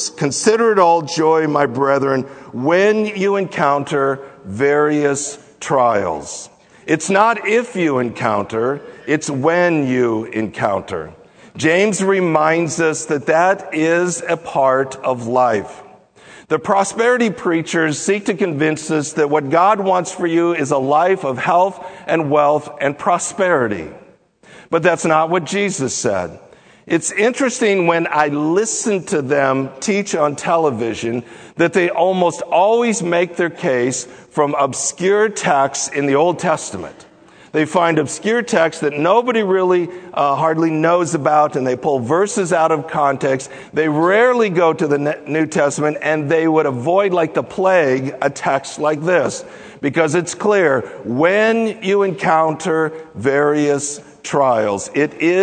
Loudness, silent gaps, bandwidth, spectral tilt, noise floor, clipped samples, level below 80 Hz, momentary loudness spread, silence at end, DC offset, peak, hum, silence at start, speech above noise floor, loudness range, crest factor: -16 LUFS; none; 9.4 kHz; -4.5 dB/octave; -47 dBFS; under 0.1%; -60 dBFS; 7 LU; 0 s; under 0.1%; 0 dBFS; none; 0 s; 31 dB; 2 LU; 16 dB